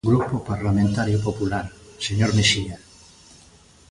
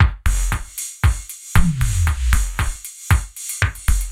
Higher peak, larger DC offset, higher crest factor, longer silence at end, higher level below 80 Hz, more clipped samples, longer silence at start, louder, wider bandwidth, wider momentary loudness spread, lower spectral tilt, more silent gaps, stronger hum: second, -4 dBFS vs 0 dBFS; neither; about the same, 18 dB vs 18 dB; first, 1.15 s vs 0 s; second, -42 dBFS vs -20 dBFS; neither; about the same, 0.05 s vs 0 s; about the same, -22 LUFS vs -21 LUFS; second, 11.5 kHz vs 16.5 kHz; first, 13 LU vs 8 LU; about the same, -5 dB/octave vs -4 dB/octave; neither; neither